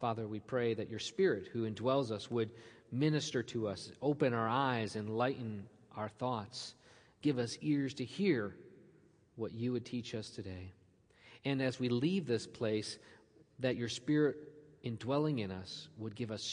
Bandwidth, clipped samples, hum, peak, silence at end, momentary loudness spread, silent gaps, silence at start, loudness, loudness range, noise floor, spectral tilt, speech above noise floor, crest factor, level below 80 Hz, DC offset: 10.5 kHz; under 0.1%; none; -18 dBFS; 0 s; 13 LU; none; 0 s; -37 LUFS; 3 LU; -66 dBFS; -6 dB/octave; 29 dB; 18 dB; -76 dBFS; under 0.1%